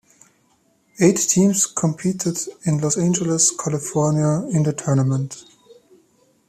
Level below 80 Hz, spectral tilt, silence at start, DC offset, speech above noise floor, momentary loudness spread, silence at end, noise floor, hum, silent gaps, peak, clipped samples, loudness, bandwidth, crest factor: -58 dBFS; -5 dB/octave; 1 s; under 0.1%; 42 dB; 8 LU; 0.75 s; -61 dBFS; none; none; -2 dBFS; under 0.1%; -19 LUFS; 15 kHz; 18 dB